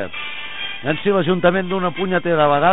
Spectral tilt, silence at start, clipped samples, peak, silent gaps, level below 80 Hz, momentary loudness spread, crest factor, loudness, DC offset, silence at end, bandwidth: -11 dB/octave; 0 s; under 0.1%; -2 dBFS; none; -52 dBFS; 10 LU; 16 dB; -19 LUFS; 3%; 0 s; 4 kHz